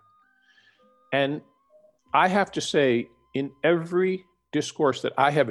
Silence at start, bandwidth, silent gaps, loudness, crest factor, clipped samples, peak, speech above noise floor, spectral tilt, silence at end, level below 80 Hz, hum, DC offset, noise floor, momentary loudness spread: 1.1 s; 12 kHz; none; -25 LUFS; 20 dB; under 0.1%; -6 dBFS; 38 dB; -5 dB/octave; 0 s; -66 dBFS; none; under 0.1%; -62 dBFS; 10 LU